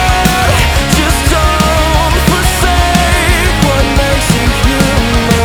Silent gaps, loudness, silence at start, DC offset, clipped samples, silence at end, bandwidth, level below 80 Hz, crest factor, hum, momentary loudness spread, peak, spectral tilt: none; -10 LUFS; 0 s; under 0.1%; under 0.1%; 0 s; over 20 kHz; -14 dBFS; 10 dB; none; 1 LU; 0 dBFS; -4 dB/octave